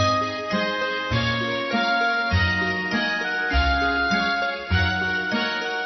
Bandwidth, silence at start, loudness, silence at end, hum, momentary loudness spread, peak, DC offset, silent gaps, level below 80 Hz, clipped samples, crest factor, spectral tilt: 6.2 kHz; 0 s; -22 LUFS; 0 s; none; 3 LU; -10 dBFS; under 0.1%; none; -36 dBFS; under 0.1%; 14 dB; -5 dB/octave